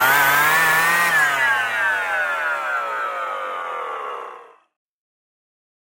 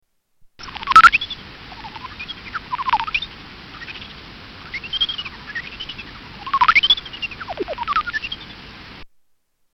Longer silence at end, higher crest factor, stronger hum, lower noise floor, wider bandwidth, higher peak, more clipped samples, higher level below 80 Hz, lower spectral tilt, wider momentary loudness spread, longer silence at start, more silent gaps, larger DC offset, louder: first, 1.55 s vs 0.7 s; about the same, 18 dB vs 22 dB; neither; second, -41 dBFS vs -64 dBFS; first, 17 kHz vs 14 kHz; second, -4 dBFS vs 0 dBFS; neither; second, -62 dBFS vs -46 dBFS; about the same, -1 dB/octave vs -2 dB/octave; second, 14 LU vs 25 LU; second, 0 s vs 0.6 s; neither; neither; about the same, -18 LUFS vs -18 LUFS